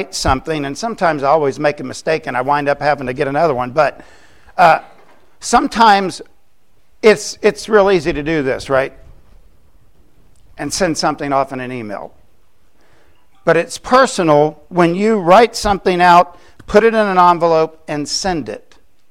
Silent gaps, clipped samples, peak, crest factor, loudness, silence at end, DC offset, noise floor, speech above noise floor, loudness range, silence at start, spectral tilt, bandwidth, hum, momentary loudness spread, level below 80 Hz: none; under 0.1%; 0 dBFS; 16 dB; -14 LUFS; 0.55 s; 0.7%; -59 dBFS; 45 dB; 9 LU; 0 s; -4.5 dB/octave; 16 kHz; none; 13 LU; -40 dBFS